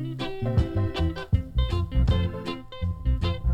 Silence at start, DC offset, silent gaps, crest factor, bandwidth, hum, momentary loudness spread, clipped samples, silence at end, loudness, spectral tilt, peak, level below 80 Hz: 0 s; under 0.1%; none; 16 dB; 8.8 kHz; none; 8 LU; under 0.1%; 0 s; -27 LUFS; -8 dB/octave; -10 dBFS; -30 dBFS